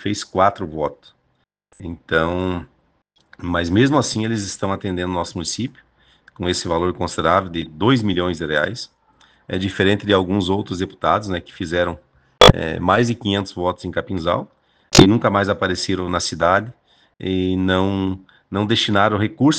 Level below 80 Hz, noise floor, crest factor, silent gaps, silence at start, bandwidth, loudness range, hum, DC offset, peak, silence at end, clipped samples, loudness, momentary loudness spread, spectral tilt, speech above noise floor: -40 dBFS; -67 dBFS; 20 dB; none; 0 s; 10.5 kHz; 5 LU; none; under 0.1%; 0 dBFS; 0 s; 0.1%; -19 LUFS; 12 LU; -5 dB/octave; 48 dB